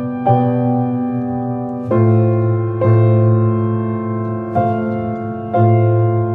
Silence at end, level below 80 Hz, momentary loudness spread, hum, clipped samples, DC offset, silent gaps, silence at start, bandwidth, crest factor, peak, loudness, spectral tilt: 0 s; -52 dBFS; 8 LU; none; under 0.1%; under 0.1%; none; 0 s; 3.4 kHz; 14 dB; 0 dBFS; -16 LUFS; -12.5 dB/octave